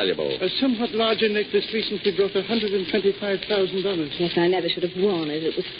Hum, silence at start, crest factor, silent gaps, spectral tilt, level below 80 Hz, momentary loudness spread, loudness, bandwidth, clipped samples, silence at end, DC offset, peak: none; 0 s; 14 dB; none; -10 dB/octave; -58 dBFS; 4 LU; -23 LUFS; 5.2 kHz; under 0.1%; 0 s; under 0.1%; -8 dBFS